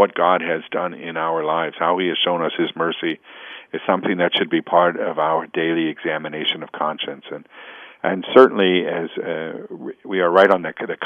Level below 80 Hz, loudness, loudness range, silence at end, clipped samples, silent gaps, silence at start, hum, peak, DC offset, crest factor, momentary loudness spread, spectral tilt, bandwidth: -72 dBFS; -19 LUFS; 4 LU; 0 s; under 0.1%; none; 0 s; none; 0 dBFS; under 0.1%; 20 dB; 17 LU; -7 dB/octave; 5.4 kHz